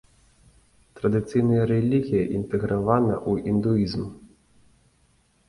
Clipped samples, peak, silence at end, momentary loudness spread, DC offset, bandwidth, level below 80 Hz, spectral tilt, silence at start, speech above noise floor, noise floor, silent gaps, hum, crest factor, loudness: under 0.1%; -6 dBFS; 1.25 s; 6 LU; under 0.1%; 11.5 kHz; -50 dBFS; -9 dB/octave; 0.95 s; 41 dB; -63 dBFS; none; none; 20 dB; -24 LUFS